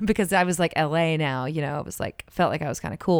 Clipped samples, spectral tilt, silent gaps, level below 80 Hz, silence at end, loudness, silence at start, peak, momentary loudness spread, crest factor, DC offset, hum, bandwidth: under 0.1%; -5.5 dB/octave; none; -50 dBFS; 0 s; -25 LUFS; 0 s; -8 dBFS; 9 LU; 16 dB; under 0.1%; none; 19.5 kHz